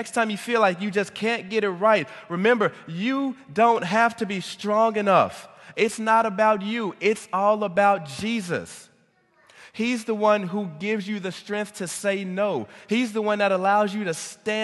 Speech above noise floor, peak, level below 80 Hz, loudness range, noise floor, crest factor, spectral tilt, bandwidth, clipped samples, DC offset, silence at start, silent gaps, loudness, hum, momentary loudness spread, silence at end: 39 dB; -6 dBFS; -68 dBFS; 5 LU; -62 dBFS; 18 dB; -4.5 dB/octave; 12.5 kHz; under 0.1%; under 0.1%; 0 s; none; -23 LUFS; none; 10 LU; 0 s